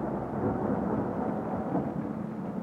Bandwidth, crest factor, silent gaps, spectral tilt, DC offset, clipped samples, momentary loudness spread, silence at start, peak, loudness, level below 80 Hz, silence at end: 7.2 kHz; 14 dB; none; -10.5 dB/octave; under 0.1%; under 0.1%; 5 LU; 0 s; -16 dBFS; -32 LUFS; -52 dBFS; 0 s